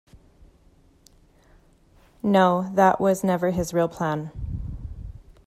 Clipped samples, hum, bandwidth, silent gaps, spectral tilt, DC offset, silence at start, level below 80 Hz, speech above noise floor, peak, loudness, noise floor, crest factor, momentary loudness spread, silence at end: under 0.1%; none; 15 kHz; none; -6.5 dB/octave; under 0.1%; 0.15 s; -44 dBFS; 36 dB; -6 dBFS; -23 LUFS; -57 dBFS; 20 dB; 19 LU; 0.25 s